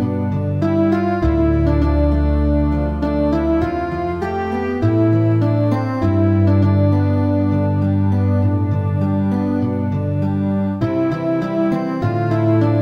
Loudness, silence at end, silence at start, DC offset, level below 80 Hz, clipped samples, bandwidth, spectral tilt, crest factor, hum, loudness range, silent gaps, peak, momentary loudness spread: -17 LUFS; 0 s; 0 s; under 0.1%; -26 dBFS; under 0.1%; 5.8 kHz; -10 dB/octave; 12 dB; none; 3 LU; none; -4 dBFS; 5 LU